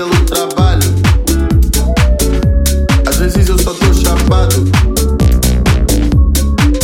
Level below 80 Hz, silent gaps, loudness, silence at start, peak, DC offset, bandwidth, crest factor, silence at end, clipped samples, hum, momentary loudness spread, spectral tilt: -12 dBFS; none; -11 LUFS; 0 s; 0 dBFS; under 0.1%; 17 kHz; 10 dB; 0 s; under 0.1%; none; 2 LU; -5 dB/octave